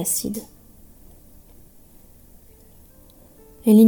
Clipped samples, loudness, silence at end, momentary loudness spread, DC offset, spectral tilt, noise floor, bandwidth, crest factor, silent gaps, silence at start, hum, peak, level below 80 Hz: under 0.1%; -22 LUFS; 0 s; 28 LU; under 0.1%; -6 dB/octave; -49 dBFS; 19 kHz; 20 dB; none; 0 s; none; -4 dBFS; -52 dBFS